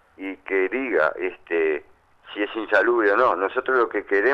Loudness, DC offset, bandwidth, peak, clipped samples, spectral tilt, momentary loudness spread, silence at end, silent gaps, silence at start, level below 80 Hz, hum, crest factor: -22 LUFS; under 0.1%; 6 kHz; -6 dBFS; under 0.1%; -5.5 dB/octave; 12 LU; 0 s; none; 0.2 s; -62 dBFS; none; 16 dB